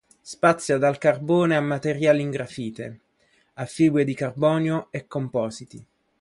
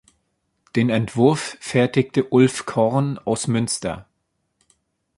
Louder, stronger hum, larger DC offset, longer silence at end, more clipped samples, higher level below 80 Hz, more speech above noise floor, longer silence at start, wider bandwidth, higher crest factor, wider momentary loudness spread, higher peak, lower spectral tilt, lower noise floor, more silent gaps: second, -23 LUFS vs -20 LUFS; neither; neither; second, 0.4 s vs 1.15 s; neither; second, -64 dBFS vs -54 dBFS; second, 42 dB vs 53 dB; second, 0.25 s vs 0.75 s; about the same, 11.5 kHz vs 11.5 kHz; about the same, 20 dB vs 20 dB; first, 14 LU vs 8 LU; about the same, -4 dBFS vs -2 dBFS; about the same, -6.5 dB/octave vs -5.5 dB/octave; second, -64 dBFS vs -73 dBFS; neither